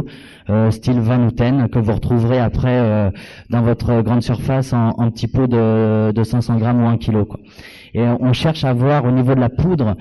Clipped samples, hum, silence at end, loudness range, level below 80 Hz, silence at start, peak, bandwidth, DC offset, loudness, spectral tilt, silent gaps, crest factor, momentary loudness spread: under 0.1%; none; 0 s; 1 LU; -36 dBFS; 0 s; -6 dBFS; 11.5 kHz; under 0.1%; -16 LUFS; -8.5 dB/octave; none; 10 dB; 5 LU